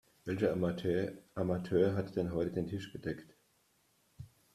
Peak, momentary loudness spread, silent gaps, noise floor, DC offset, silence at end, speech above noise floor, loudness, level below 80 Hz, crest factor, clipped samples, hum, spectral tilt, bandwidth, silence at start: -16 dBFS; 14 LU; none; -73 dBFS; under 0.1%; 0.3 s; 38 dB; -35 LUFS; -64 dBFS; 20 dB; under 0.1%; none; -8 dB/octave; 13.5 kHz; 0.25 s